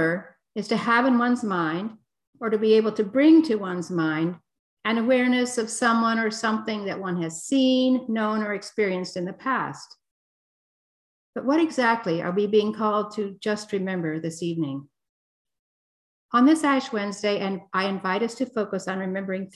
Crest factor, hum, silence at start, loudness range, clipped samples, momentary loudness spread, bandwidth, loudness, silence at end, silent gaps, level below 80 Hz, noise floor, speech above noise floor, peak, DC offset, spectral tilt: 18 dB; none; 0 s; 7 LU; under 0.1%; 10 LU; 12 kHz; -24 LUFS; 0.05 s; 2.27-2.33 s, 4.59-4.77 s, 10.11-11.33 s, 15.09-15.45 s, 15.59-16.29 s; -72 dBFS; under -90 dBFS; over 67 dB; -6 dBFS; under 0.1%; -5 dB/octave